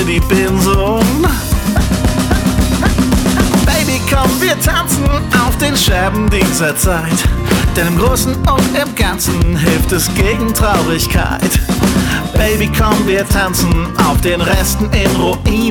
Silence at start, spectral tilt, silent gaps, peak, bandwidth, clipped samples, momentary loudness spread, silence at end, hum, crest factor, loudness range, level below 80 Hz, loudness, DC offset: 0 s; -4.5 dB/octave; none; 0 dBFS; 19 kHz; under 0.1%; 2 LU; 0 s; none; 12 dB; 1 LU; -18 dBFS; -13 LUFS; under 0.1%